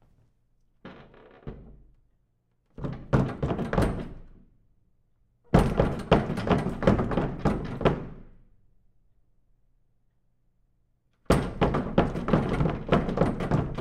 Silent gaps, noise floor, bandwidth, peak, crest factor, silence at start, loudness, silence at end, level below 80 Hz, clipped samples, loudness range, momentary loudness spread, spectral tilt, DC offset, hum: none; -70 dBFS; 14 kHz; -6 dBFS; 24 dB; 0.85 s; -27 LUFS; 0 s; -38 dBFS; under 0.1%; 9 LU; 17 LU; -7.5 dB/octave; under 0.1%; none